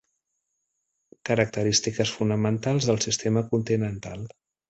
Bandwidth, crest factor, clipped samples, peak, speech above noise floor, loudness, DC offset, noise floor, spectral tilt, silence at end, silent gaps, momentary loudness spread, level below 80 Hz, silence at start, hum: 8.2 kHz; 20 dB; under 0.1%; -6 dBFS; 54 dB; -25 LUFS; under 0.1%; -79 dBFS; -4.5 dB/octave; 0.4 s; none; 14 LU; -56 dBFS; 1.25 s; none